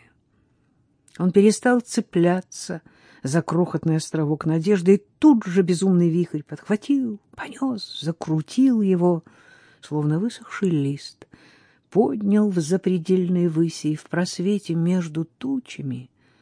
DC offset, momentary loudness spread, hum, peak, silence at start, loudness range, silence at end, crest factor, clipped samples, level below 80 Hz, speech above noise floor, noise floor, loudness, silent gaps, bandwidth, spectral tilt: under 0.1%; 13 LU; none; -4 dBFS; 1.2 s; 4 LU; 0.35 s; 18 dB; under 0.1%; -68 dBFS; 43 dB; -64 dBFS; -22 LUFS; none; 10.5 kHz; -7 dB/octave